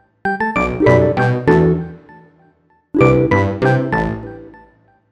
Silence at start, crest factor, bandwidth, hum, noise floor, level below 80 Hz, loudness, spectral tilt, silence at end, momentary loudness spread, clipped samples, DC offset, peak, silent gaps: 0.25 s; 16 dB; 8.4 kHz; none; -55 dBFS; -36 dBFS; -15 LUFS; -8.5 dB/octave; 0.6 s; 10 LU; under 0.1%; under 0.1%; 0 dBFS; none